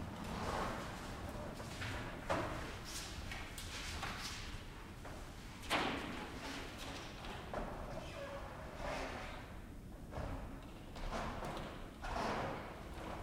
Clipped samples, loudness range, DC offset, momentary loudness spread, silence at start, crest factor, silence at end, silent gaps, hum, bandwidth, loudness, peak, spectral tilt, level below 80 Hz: under 0.1%; 3 LU; under 0.1%; 11 LU; 0 s; 22 dB; 0 s; none; none; 16 kHz; -45 LUFS; -22 dBFS; -4.5 dB/octave; -52 dBFS